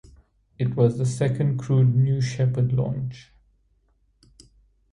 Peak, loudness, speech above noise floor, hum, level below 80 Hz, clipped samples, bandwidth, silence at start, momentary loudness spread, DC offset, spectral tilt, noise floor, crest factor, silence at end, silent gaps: -6 dBFS; -23 LUFS; 43 dB; none; -54 dBFS; under 0.1%; 10.5 kHz; 0.6 s; 9 LU; under 0.1%; -8 dB/octave; -65 dBFS; 18 dB; 1.7 s; none